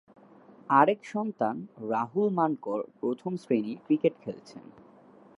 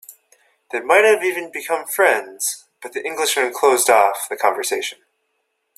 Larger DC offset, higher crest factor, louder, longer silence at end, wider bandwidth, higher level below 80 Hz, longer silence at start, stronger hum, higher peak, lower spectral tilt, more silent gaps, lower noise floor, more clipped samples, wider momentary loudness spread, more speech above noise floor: neither; first, 24 dB vs 18 dB; second, -28 LUFS vs -18 LUFS; about the same, 0.8 s vs 0.85 s; second, 11 kHz vs 16 kHz; second, -80 dBFS vs -70 dBFS; first, 0.7 s vs 0.1 s; neither; second, -6 dBFS vs 0 dBFS; first, -8 dB/octave vs 0 dB/octave; neither; second, -55 dBFS vs -71 dBFS; neither; first, 17 LU vs 14 LU; second, 27 dB vs 53 dB